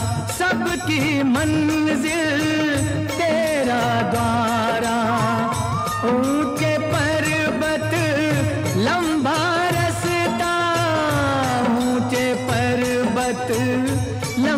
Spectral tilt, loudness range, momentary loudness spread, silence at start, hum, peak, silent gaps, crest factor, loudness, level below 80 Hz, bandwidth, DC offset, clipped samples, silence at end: -5 dB/octave; 1 LU; 2 LU; 0 s; none; -6 dBFS; none; 12 dB; -20 LUFS; -44 dBFS; 16 kHz; under 0.1%; under 0.1%; 0 s